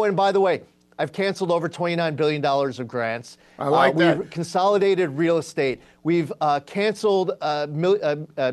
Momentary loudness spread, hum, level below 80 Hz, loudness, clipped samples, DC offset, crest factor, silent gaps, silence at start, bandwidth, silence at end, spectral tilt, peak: 8 LU; none; -66 dBFS; -22 LUFS; under 0.1%; under 0.1%; 16 dB; none; 0 s; 12.5 kHz; 0 s; -6 dB/octave; -4 dBFS